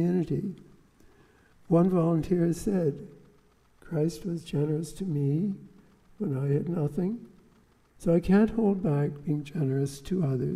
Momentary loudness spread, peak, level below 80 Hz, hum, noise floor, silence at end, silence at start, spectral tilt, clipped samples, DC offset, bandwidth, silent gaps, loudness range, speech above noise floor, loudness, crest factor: 12 LU; -12 dBFS; -52 dBFS; none; -62 dBFS; 0 s; 0 s; -8.5 dB/octave; under 0.1%; under 0.1%; 13.5 kHz; none; 4 LU; 35 dB; -28 LUFS; 16 dB